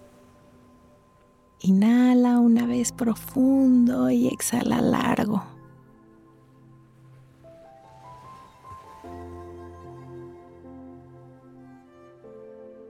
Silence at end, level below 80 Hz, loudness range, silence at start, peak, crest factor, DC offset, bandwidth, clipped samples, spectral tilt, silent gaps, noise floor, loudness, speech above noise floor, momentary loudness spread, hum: 0.2 s; -60 dBFS; 24 LU; 1.65 s; -12 dBFS; 14 dB; under 0.1%; 15.5 kHz; under 0.1%; -6 dB/octave; none; -58 dBFS; -21 LUFS; 37 dB; 27 LU; none